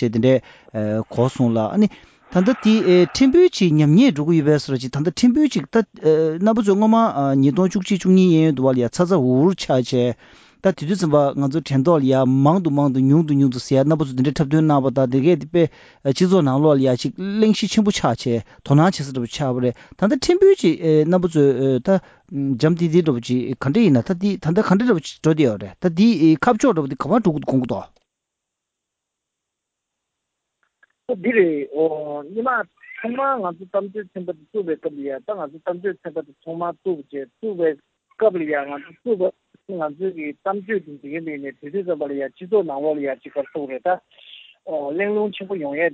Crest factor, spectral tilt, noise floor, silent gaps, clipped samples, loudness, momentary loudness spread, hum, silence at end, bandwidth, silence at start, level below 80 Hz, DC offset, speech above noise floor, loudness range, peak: 16 dB; -7 dB/octave; -81 dBFS; none; under 0.1%; -19 LUFS; 13 LU; none; 0 s; 8 kHz; 0 s; -54 dBFS; under 0.1%; 63 dB; 9 LU; -2 dBFS